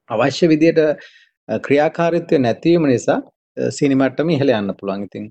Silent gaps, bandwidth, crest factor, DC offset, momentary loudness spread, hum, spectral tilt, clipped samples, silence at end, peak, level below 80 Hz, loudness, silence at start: 1.37-1.47 s, 3.36-3.55 s; 8.8 kHz; 16 dB; under 0.1%; 11 LU; none; -6.5 dB/octave; under 0.1%; 0 s; -2 dBFS; -56 dBFS; -17 LUFS; 0.1 s